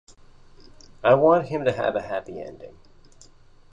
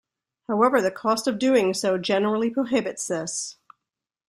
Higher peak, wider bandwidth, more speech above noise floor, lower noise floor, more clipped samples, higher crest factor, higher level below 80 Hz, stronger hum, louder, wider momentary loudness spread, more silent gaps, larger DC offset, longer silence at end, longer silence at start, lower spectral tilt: about the same, -4 dBFS vs -6 dBFS; second, 8.2 kHz vs 14 kHz; second, 29 dB vs 64 dB; second, -51 dBFS vs -87 dBFS; neither; about the same, 20 dB vs 18 dB; first, -56 dBFS vs -68 dBFS; neither; about the same, -22 LUFS vs -23 LUFS; first, 21 LU vs 9 LU; neither; neither; first, 1.05 s vs 0.75 s; first, 1 s vs 0.5 s; first, -7 dB/octave vs -4 dB/octave